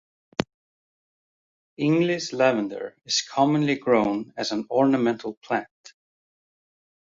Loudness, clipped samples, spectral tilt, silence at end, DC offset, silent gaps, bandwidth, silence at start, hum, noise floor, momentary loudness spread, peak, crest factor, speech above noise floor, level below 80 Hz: -24 LUFS; under 0.1%; -5 dB/octave; 1.45 s; under 0.1%; 0.54-1.77 s, 5.37-5.41 s; 7.8 kHz; 0.4 s; none; under -90 dBFS; 10 LU; -2 dBFS; 24 dB; over 67 dB; -64 dBFS